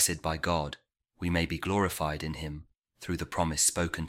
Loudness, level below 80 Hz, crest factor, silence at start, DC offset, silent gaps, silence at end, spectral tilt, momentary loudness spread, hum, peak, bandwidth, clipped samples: -30 LUFS; -46 dBFS; 20 dB; 0 s; under 0.1%; 2.78-2.82 s; 0 s; -3.5 dB/octave; 15 LU; none; -12 dBFS; 16.5 kHz; under 0.1%